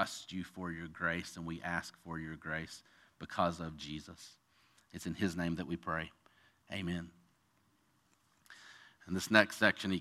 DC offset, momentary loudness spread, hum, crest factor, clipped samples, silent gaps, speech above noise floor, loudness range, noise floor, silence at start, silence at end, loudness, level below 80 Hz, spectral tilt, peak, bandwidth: under 0.1%; 23 LU; none; 32 dB; under 0.1%; none; 36 dB; 8 LU; -74 dBFS; 0 s; 0 s; -37 LUFS; -64 dBFS; -4.5 dB/octave; -8 dBFS; 15 kHz